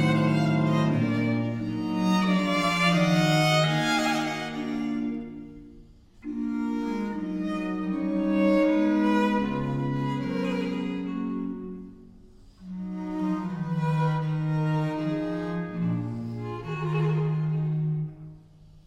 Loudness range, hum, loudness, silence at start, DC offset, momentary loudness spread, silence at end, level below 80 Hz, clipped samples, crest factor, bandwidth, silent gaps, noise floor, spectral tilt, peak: 8 LU; none; -26 LUFS; 0 s; under 0.1%; 13 LU; 0.05 s; -54 dBFS; under 0.1%; 16 dB; 14.5 kHz; none; -51 dBFS; -6.5 dB/octave; -10 dBFS